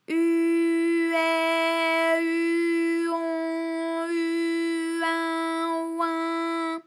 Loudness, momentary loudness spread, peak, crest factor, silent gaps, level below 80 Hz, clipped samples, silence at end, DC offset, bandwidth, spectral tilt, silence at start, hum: -25 LUFS; 5 LU; -14 dBFS; 12 dB; none; under -90 dBFS; under 0.1%; 0.05 s; under 0.1%; 12 kHz; -2 dB/octave; 0.1 s; none